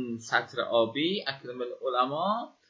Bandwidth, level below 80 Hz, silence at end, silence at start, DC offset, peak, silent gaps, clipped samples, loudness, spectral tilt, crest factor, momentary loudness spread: 8 kHz; -78 dBFS; 0.2 s; 0 s; under 0.1%; -10 dBFS; none; under 0.1%; -29 LUFS; -4.5 dB/octave; 20 dB; 8 LU